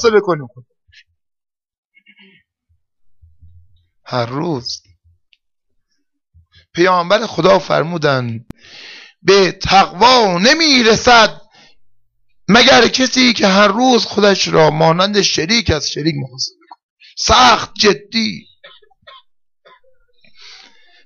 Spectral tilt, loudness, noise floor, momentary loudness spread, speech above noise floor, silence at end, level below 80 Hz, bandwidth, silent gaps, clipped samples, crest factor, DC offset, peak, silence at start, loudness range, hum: -3.5 dB/octave; -12 LUFS; -69 dBFS; 14 LU; 57 dB; 2.65 s; -42 dBFS; 7.4 kHz; 1.78-1.90 s, 16.83-16.97 s; under 0.1%; 14 dB; under 0.1%; -2 dBFS; 0 s; 15 LU; none